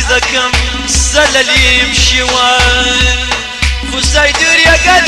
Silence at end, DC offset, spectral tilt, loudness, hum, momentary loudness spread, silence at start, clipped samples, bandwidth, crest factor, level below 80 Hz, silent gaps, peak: 0 s; under 0.1%; -2 dB/octave; -8 LUFS; none; 7 LU; 0 s; under 0.1%; 13.5 kHz; 10 dB; -18 dBFS; none; 0 dBFS